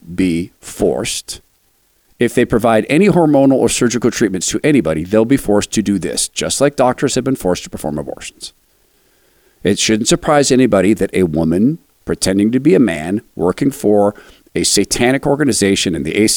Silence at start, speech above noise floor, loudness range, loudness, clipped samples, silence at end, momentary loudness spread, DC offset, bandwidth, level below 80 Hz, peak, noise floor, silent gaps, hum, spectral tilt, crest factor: 0.05 s; 44 dB; 5 LU; -14 LUFS; under 0.1%; 0 s; 11 LU; under 0.1%; 19 kHz; -40 dBFS; -2 dBFS; -57 dBFS; none; none; -4.5 dB/octave; 14 dB